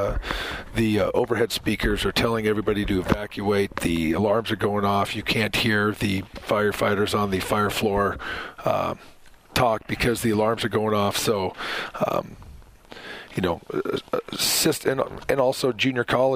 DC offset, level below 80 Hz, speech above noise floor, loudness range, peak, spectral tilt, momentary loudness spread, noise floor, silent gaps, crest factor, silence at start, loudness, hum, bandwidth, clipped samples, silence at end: under 0.1%; -40 dBFS; 21 dB; 3 LU; -4 dBFS; -4.5 dB/octave; 7 LU; -44 dBFS; none; 20 dB; 0 s; -24 LUFS; none; 16 kHz; under 0.1%; 0 s